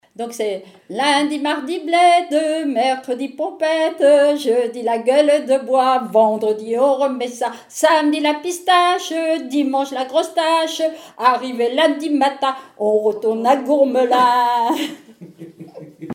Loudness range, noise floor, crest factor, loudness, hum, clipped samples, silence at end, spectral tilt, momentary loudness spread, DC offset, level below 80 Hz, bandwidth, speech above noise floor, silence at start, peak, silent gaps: 2 LU; -38 dBFS; 16 dB; -17 LUFS; none; under 0.1%; 0 s; -3 dB/octave; 9 LU; under 0.1%; -78 dBFS; 17 kHz; 21 dB; 0.2 s; -2 dBFS; none